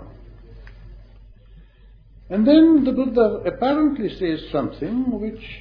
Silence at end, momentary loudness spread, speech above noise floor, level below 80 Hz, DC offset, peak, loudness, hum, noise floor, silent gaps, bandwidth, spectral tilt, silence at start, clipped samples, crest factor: 0 s; 12 LU; 29 dB; -44 dBFS; under 0.1%; -2 dBFS; -19 LUFS; none; -48 dBFS; none; 5.2 kHz; -9.5 dB/octave; 0 s; under 0.1%; 18 dB